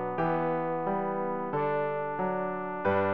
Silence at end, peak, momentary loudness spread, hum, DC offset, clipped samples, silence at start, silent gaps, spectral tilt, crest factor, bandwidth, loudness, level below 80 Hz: 0 s; -16 dBFS; 3 LU; none; 0.3%; under 0.1%; 0 s; none; -6 dB/octave; 14 dB; 5.2 kHz; -30 LUFS; -66 dBFS